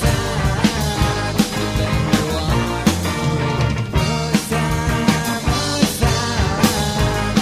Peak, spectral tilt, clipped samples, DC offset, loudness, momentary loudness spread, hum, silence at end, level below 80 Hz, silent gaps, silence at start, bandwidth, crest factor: -2 dBFS; -5 dB/octave; under 0.1%; under 0.1%; -18 LUFS; 3 LU; none; 0 s; -28 dBFS; none; 0 s; 15.5 kHz; 16 dB